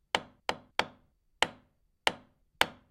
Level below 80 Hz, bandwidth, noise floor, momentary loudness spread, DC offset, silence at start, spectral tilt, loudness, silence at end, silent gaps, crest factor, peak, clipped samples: -66 dBFS; 16 kHz; -68 dBFS; 7 LU; under 0.1%; 0.15 s; -1.5 dB/octave; -33 LUFS; 0.2 s; none; 32 dB; -4 dBFS; under 0.1%